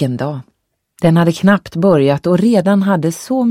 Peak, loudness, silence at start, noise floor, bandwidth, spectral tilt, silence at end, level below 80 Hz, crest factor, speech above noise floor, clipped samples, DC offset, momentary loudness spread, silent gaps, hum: 0 dBFS; -13 LUFS; 0 s; -53 dBFS; 15.5 kHz; -7 dB/octave; 0 s; -50 dBFS; 14 dB; 40 dB; under 0.1%; under 0.1%; 7 LU; none; none